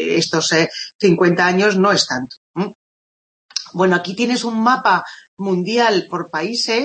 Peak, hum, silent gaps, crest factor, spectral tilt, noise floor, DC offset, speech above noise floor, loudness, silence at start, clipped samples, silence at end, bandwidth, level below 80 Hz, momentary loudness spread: 0 dBFS; none; 0.95-0.99 s, 2.37-2.54 s, 2.75-3.49 s, 5.28-5.37 s; 16 dB; -4 dB/octave; under -90 dBFS; under 0.1%; over 73 dB; -17 LUFS; 0 s; under 0.1%; 0 s; 8.8 kHz; -66 dBFS; 12 LU